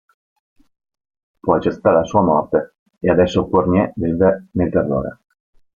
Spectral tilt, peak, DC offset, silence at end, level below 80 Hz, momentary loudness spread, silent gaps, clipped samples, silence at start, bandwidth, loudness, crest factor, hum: -8 dB/octave; 0 dBFS; under 0.1%; 0.65 s; -46 dBFS; 8 LU; 2.79-2.86 s; under 0.1%; 1.45 s; 7.2 kHz; -17 LUFS; 18 dB; none